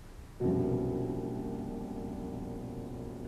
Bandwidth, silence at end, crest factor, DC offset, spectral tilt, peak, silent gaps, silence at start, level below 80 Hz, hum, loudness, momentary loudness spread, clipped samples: 14 kHz; 0 s; 16 dB; under 0.1%; -9 dB/octave; -20 dBFS; none; 0 s; -50 dBFS; none; -36 LUFS; 11 LU; under 0.1%